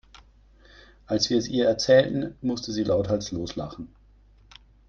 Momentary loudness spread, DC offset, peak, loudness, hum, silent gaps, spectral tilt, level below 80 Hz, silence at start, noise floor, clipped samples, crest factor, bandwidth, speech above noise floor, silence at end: 16 LU; under 0.1%; -6 dBFS; -24 LUFS; none; none; -5 dB/octave; -52 dBFS; 1.1 s; -55 dBFS; under 0.1%; 20 dB; 7.2 kHz; 31 dB; 1 s